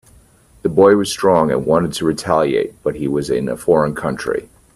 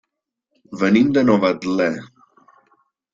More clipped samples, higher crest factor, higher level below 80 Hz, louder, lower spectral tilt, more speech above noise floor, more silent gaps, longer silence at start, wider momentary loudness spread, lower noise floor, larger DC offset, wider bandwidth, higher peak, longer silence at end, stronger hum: neither; about the same, 16 dB vs 18 dB; first, -46 dBFS vs -56 dBFS; about the same, -17 LUFS vs -17 LUFS; second, -5.5 dB/octave vs -7 dB/octave; second, 33 dB vs 61 dB; neither; about the same, 0.65 s vs 0.7 s; about the same, 10 LU vs 12 LU; second, -49 dBFS vs -78 dBFS; neither; first, 14 kHz vs 7.6 kHz; about the same, 0 dBFS vs -2 dBFS; second, 0.3 s vs 1.1 s; neither